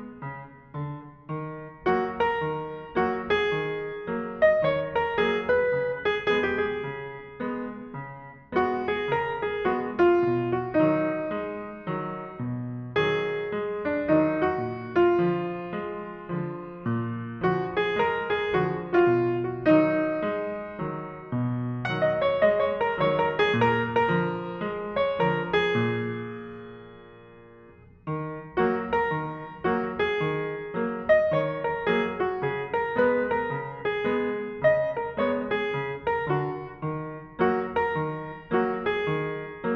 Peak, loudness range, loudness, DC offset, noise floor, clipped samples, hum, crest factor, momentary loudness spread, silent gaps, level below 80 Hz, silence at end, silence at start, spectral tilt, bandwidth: -8 dBFS; 4 LU; -26 LUFS; under 0.1%; -51 dBFS; under 0.1%; none; 18 dB; 12 LU; none; -56 dBFS; 0 s; 0 s; -8 dB/octave; 6.4 kHz